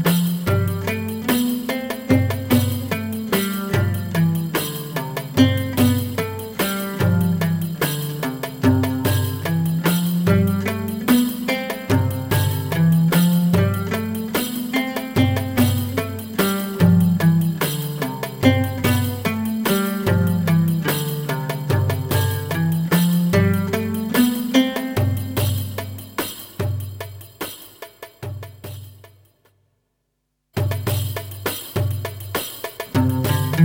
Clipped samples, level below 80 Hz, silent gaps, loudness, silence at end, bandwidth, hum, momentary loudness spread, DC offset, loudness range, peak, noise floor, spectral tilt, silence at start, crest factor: under 0.1%; -48 dBFS; none; -20 LUFS; 0 s; 18.5 kHz; none; 10 LU; under 0.1%; 9 LU; -2 dBFS; -73 dBFS; -6 dB/octave; 0 s; 18 dB